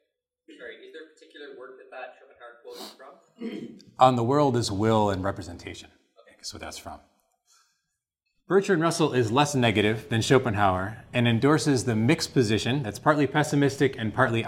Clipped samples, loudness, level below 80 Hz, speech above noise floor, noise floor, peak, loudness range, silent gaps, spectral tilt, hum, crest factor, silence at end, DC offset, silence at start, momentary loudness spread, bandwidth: under 0.1%; -24 LUFS; -58 dBFS; 56 dB; -81 dBFS; -4 dBFS; 19 LU; none; -5.5 dB/octave; none; 22 dB; 0 s; under 0.1%; 0.5 s; 22 LU; 16 kHz